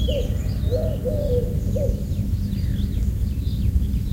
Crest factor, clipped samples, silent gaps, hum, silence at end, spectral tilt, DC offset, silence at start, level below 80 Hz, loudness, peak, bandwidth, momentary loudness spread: 14 dB; under 0.1%; none; none; 0 s; -8 dB/octave; under 0.1%; 0 s; -24 dBFS; -24 LUFS; -8 dBFS; 16 kHz; 2 LU